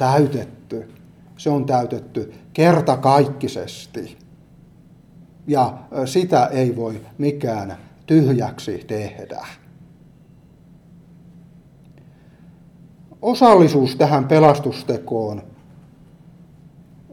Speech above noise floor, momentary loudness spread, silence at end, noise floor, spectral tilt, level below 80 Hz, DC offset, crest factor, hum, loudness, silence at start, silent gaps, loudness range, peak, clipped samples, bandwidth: 31 dB; 20 LU; 1.7 s; -48 dBFS; -7 dB/octave; -58 dBFS; under 0.1%; 20 dB; none; -18 LUFS; 0 s; none; 7 LU; 0 dBFS; under 0.1%; 15 kHz